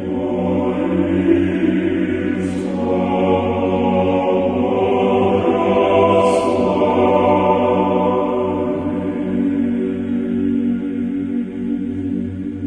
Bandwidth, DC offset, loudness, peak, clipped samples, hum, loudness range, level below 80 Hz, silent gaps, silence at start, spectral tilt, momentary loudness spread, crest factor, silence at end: 10.5 kHz; under 0.1%; -17 LUFS; -2 dBFS; under 0.1%; none; 5 LU; -46 dBFS; none; 0 s; -8 dB/octave; 7 LU; 14 dB; 0 s